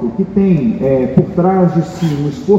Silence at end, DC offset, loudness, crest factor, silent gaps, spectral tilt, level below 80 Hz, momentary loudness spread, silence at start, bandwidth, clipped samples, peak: 0 s; under 0.1%; -14 LUFS; 12 dB; none; -9 dB/octave; -40 dBFS; 5 LU; 0 s; 7.8 kHz; 0.2%; 0 dBFS